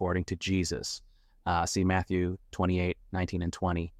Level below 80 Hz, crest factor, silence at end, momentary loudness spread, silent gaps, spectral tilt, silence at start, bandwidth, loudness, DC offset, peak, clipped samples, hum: -48 dBFS; 16 dB; 0.1 s; 7 LU; none; -5.5 dB/octave; 0 s; 13 kHz; -31 LUFS; under 0.1%; -14 dBFS; under 0.1%; none